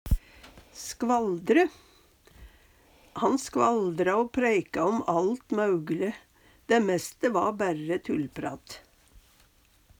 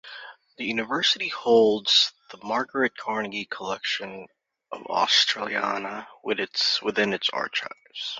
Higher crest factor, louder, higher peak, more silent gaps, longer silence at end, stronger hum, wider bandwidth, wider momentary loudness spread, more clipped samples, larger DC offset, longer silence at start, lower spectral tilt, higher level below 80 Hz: about the same, 18 dB vs 20 dB; second, -27 LUFS vs -24 LUFS; second, -10 dBFS vs -6 dBFS; neither; first, 1.2 s vs 0 s; neither; first, over 20 kHz vs 7.8 kHz; second, 14 LU vs 17 LU; neither; neither; about the same, 0.05 s vs 0.05 s; first, -5.5 dB/octave vs -2 dB/octave; first, -42 dBFS vs -70 dBFS